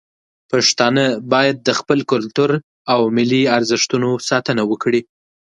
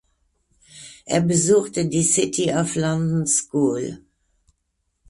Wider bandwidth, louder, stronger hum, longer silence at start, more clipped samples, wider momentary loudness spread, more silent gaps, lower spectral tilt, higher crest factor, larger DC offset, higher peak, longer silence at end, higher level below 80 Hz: about the same, 11.5 kHz vs 11.5 kHz; first, -16 LUFS vs -20 LUFS; neither; second, 0.5 s vs 0.75 s; neither; second, 5 LU vs 13 LU; first, 2.63-2.85 s vs none; about the same, -4 dB/octave vs -4.5 dB/octave; about the same, 16 dB vs 18 dB; neither; first, 0 dBFS vs -6 dBFS; second, 0.6 s vs 1.1 s; second, -62 dBFS vs -54 dBFS